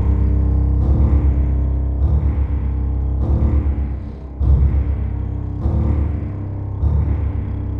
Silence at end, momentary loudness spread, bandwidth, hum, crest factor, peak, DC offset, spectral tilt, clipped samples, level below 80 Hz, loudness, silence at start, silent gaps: 0 s; 8 LU; 2.5 kHz; none; 12 dB; -4 dBFS; under 0.1%; -11.5 dB/octave; under 0.1%; -18 dBFS; -19 LUFS; 0 s; none